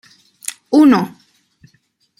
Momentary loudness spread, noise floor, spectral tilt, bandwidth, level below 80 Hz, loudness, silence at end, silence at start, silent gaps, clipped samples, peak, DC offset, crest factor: 18 LU; -60 dBFS; -5 dB/octave; 15.5 kHz; -60 dBFS; -12 LUFS; 1.1 s; 0.7 s; none; under 0.1%; -2 dBFS; under 0.1%; 16 dB